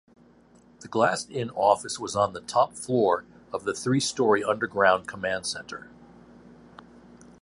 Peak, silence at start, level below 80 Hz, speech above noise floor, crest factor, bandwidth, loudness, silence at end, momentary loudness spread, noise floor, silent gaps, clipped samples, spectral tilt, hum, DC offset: -6 dBFS; 0.8 s; -62 dBFS; 31 dB; 22 dB; 11.5 kHz; -26 LUFS; 0.95 s; 10 LU; -56 dBFS; none; under 0.1%; -4 dB/octave; none; under 0.1%